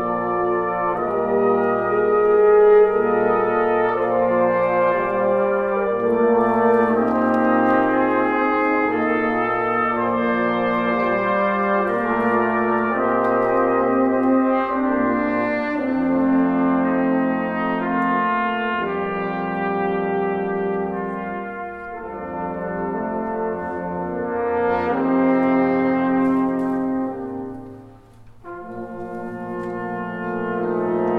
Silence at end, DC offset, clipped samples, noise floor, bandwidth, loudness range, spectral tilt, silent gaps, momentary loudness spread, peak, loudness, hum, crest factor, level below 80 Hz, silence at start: 0 s; under 0.1%; under 0.1%; -44 dBFS; 5 kHz; 9 LU; -8.5 dB/octave; none; 10 LU; -6 dBFS; -20 LUFS; none; 14 dB; -52 dBFS; 0 s